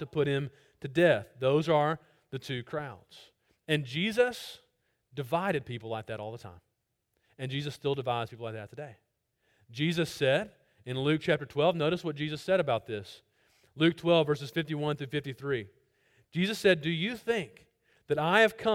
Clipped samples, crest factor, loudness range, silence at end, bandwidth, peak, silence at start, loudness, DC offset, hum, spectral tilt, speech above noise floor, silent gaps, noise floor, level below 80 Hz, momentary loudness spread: under 0.1%; 22 dB; 7 LU; 0 s; 16.5 kHz; -8 dBFS; 0 s; -30 LUFS; under 0.1%; none; -6 dB/octave; 50 dB; none; -80 dBFS; -68 dBFS; 18 LU